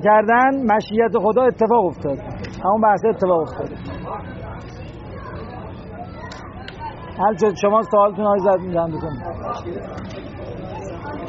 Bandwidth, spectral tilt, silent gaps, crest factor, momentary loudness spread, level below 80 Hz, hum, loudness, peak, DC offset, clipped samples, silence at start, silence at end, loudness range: 7.6 kHz; -5.5 dB/octave; none; 16 dB; 18 LU; -44 dBFS; none; -19 LUFS; -4 dBFS; under 0.1%; under 0.1%; 0 s; 0 s; 13 LU